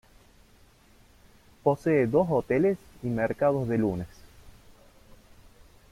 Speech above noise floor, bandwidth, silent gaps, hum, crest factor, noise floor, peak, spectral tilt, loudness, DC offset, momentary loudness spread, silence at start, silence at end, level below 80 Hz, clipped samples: 32 dB; 15.5 kHz; none; none; 20 dB; -58 dBFS; -10 dBFS; -8.5 dB/octave; -26 LUFS; under 0.1%; 10 LU; 1.65 s; 1.4 s; -56 dBFS; under 0.1%